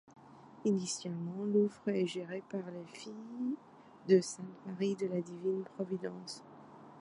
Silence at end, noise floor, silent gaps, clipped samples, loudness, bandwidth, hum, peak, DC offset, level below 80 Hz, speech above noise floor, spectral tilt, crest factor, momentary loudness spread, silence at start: 0 s; -55 dBFS; none; under 0.1%; -36 LUFS; 11.5 kHz; none; -16 dBFS; under 0.1%; -84 dBFS; 19 dB; -5.5 dB/octave; 22 dB; 17 LU; 0.1 s